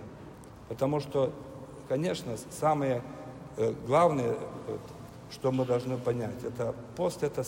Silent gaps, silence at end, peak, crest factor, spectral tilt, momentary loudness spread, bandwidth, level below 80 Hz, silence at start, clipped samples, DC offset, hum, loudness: none; 0 s; -12 dBFS; 20 dB; -6.5 dB/octave; 19 LU; 16 kHz; -60 dBFS; 0 s; under 0.1%; under 0.1%; none; -31 LUFS